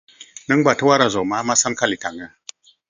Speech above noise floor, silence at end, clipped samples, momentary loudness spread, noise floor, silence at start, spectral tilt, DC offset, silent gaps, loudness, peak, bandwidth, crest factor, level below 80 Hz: 25 dB; 0.65 s; under 0.1%; 19 LU; -44 dBFS; 0.2 s; -3 dB/octave; under 0.1%; none; -18 LUFS; 0 dBFS; 10 kHz; 20 dB; -58 dBFS